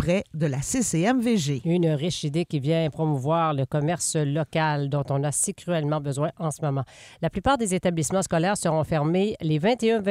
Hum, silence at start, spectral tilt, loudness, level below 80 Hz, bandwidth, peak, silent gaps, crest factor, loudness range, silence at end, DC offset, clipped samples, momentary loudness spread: none; 0 s; -5.5 dB/octave; -25 LUFS; -50 dBFS; 15.5 kHz; -8 dBFS; none; 16 dB; 2 LU; 0 s; under 0.1%; under 0.1%; 5 LU